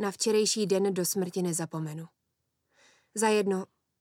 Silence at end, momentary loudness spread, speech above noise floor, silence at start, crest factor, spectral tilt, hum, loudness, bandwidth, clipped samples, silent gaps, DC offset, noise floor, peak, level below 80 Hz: 0.35 s; 13 LU; 52 dB; 0 s; 18 dB; -4 dB/octave; none; -28 LUFS; 17.5 kHz; under 0.1%; none; under 0.1%; -80 dBFS; -12 dBFS; -84 dBFS